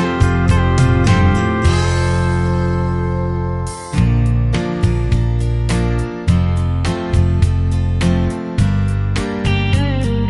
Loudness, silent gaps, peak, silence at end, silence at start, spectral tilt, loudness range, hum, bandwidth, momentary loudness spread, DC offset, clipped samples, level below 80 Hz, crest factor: -16 LUFS; none; -2 dBFS; 0 s; 0 s; -7 dB/octave; 2 LU; none; 11.5 kHz; 6 LU; under 0.1%; under 0.1%; -22 dBFS; 14 dB